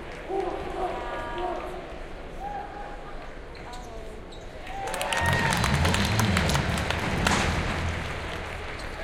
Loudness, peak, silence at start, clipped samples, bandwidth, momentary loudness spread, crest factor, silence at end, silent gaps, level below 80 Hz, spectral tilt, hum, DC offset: -27 LUFS; -4 dBFS; 0 s; under 0.1%; 17 kHz; 17 LU; 24 dB; 0 s; none; -38 dBFS; -4.5 dB/octave; none; under 0.1%